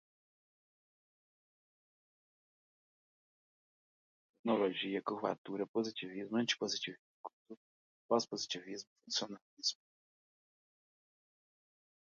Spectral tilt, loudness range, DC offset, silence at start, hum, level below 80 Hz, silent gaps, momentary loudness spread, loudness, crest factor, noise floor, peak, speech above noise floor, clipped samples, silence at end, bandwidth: -2.5 dB/octave; 6 LU; under 0.1%; 4.45 s; none; -90 dBFS; 5.38-5.45 s, 5.69-5.74 s, 6.99-7.24 s, 7.33-7.45 s, 7.57-8.09 s, 8.87-8.96 s, 9.42-9.57 s; 18 LU; -38 LUFS; 26 dB; under -90 dBFS; -18 dBFS; over 52 dB; under 0.1%; 2.35 s; 7.4 kHz